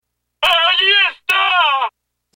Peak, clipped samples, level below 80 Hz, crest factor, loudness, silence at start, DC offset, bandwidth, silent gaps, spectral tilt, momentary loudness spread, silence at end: -2 dBFS; under 0.1%; -54 dBFS; 14 dB; -13 LUFS; 0.4 s; under 0.1%; 17 kHz; none; 1 dB/octave; 8 LU; 0.5 s